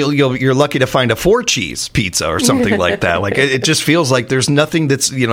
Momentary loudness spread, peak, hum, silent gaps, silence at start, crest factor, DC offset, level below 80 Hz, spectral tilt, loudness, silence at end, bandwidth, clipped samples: 3 LU; 0 dBFS; none; none; 0 s; 14 dB; under 0.1%; -38 dBFS; -4 dB/octave; -14 LUFS; 0 s; 17 kHz; under 0.1%